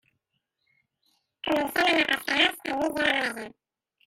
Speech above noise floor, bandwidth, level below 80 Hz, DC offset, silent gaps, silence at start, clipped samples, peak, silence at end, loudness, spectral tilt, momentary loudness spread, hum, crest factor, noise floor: 53 dB; 16 kHz; -64 dBFS; under 0.1%; none; 1.45 s; under 0.1%; -8 dBFS; 0.6 s; -24 LUFS; -2.5 dB/octave; 13 LU; none; 20 dB; -79 dBFS